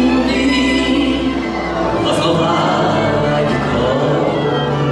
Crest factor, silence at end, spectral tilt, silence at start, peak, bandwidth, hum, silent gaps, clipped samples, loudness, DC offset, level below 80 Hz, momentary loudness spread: 12 dB; 0 s; -6 dB/octave; 0 s; -4 dBFS; 12 kHz; none; none; under 0.1%; -15 LUFS; under 0.1%; -34 dBFS; 4 LU